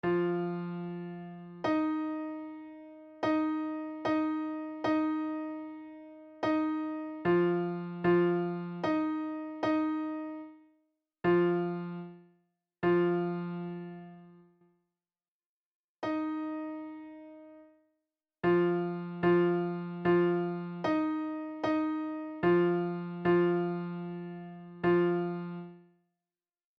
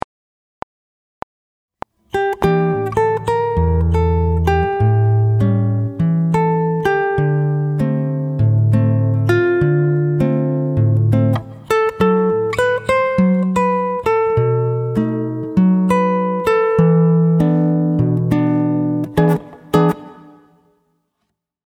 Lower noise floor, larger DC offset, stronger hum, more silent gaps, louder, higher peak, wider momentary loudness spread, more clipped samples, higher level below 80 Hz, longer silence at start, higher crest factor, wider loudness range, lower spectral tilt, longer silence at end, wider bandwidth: first, under -90 dBFS vs -73 dBFS; neither; neither; first, 15.28-15.40 s, 15.46-15.96 s vs none; second, -32 LUFS vs -16 LUFS; second, -16 dBFS vs 0 dBFS; first, 18 LU vs 5 LU; neither; second, -70 dBFS vs -34 dBFS; second, 0.05 s vs 2.15 s; about the same, 16 dB vs 16 dB; first, 9 LU vs 3 LU; about the same, -9 dB/octave vs -9 dB/octave; second, 1 s vs 1.55 s; second, 6.2 kHz vs 13.5 kHz